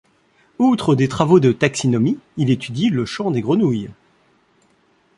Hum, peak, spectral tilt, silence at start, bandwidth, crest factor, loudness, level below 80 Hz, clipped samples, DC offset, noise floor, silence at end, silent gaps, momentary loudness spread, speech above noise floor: none; 0 dBFS; -6.5 dB/octave; 0.6 s; 11.5 kHz; 18 dB; -18 LUFS; -54 dBFS; under 0.1%; under 0.1%; -59 dBFS; 1.25 s; none; 8 LU; 42 dB